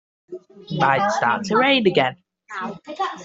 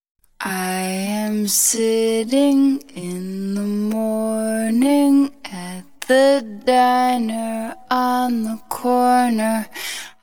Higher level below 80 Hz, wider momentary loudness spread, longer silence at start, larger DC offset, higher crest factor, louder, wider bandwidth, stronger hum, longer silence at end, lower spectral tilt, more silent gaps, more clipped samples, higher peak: about the same, -64 dBFS vs -62 dBFS; first, 23 LU vs 12 LU; about the same, 0.3 s vs 0.4 s; second, under 0.1% vs 0.5%; about the same, 20 dB vs 16 dB; about the same, -19 LUFS vs -19 LUFS; second, 8 kHz vs 20 kHz; neither; second, 0 s vs 0.15 s; about the same, -5 dB/octave vs -4 dB/octave; neither; neither; about the same, -2 dBFS vs -4 dBFS